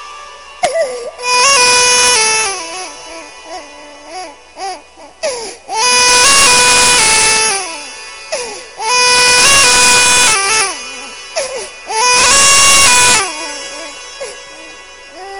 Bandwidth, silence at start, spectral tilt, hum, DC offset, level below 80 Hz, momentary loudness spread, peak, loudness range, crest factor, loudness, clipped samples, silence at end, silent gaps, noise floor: 16 kHz; 0 s; 1 dB/octave; none; under 0.1%; -42 dBFS; 22 LU; 0 dBFS; 6 LU; 12 dB; -7 LUFS; 0.6%; 0 s; none; -35 dBFS